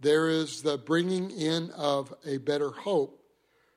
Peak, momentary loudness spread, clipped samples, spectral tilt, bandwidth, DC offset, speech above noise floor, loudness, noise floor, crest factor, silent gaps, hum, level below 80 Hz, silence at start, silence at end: -12 dBFS; 6 LU; under 0.1%; -5 dB/octave; 14 kHz; under 0.1%; 40 dB; -29 LUFS; -68 dBFS; 16 dB; none; none; -76 dBFS; 0 s; 0.65 s